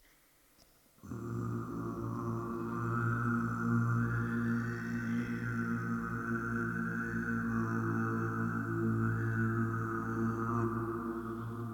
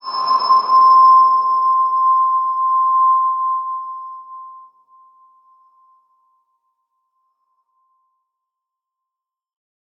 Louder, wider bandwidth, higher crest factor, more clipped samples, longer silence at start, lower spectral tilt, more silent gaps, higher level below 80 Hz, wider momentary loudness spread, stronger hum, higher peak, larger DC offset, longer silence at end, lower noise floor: second, -35 LUFS vs -13 LUFS; first, 18 kHz vs 5.8 kHz; about the same, 14 dB vs 14 dB; neither; first, 1.05 s vs 0.05 s; first, -8.5 dB/octave vs -3 dB/octave; neither; first, -56 dBFS vs -88 dBFS; second, 6 LU vs 22 LU; neither; second, -20 dBFS vs -4 dBFS; neither; second, 0 s vs 5.4 s; second, -66 dBFS vs -85 dBFS